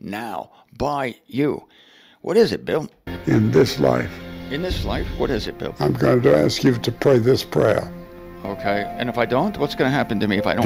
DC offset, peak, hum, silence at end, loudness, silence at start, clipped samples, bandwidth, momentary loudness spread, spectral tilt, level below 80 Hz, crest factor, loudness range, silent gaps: under 0.1%; -2 dBFS; none; 0 s; -20 LUFS; 0.05 s; under 0.1%; 16 kHz; 15 LU; -6.5 dB/octave; -40 dBFS; 18 dB; 3 LU; none